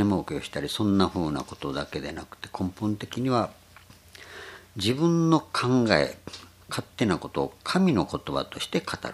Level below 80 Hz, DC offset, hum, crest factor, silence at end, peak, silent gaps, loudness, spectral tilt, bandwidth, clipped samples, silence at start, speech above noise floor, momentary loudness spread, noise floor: -54 dBFS; under 0.1%; none; 24 dB; 0 s; -2 dBFS; none; -27 LUFS; -6 dB/octave; 15 kHz; under 0.1%; 0 s; 26 dB; 17 LU; -52 dBFS